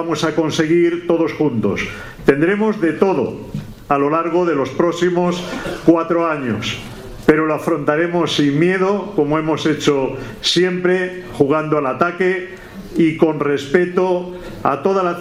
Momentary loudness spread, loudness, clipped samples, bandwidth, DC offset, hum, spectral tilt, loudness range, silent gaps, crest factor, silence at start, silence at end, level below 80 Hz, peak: 9 LU; -17 LUFS; under 0.1%; 15 kHz; under 0.1%; none; -6 dB/octave; 1 LU; none; 16 dB; 0 s; 0 s; -44 dBFS; 0 dBFS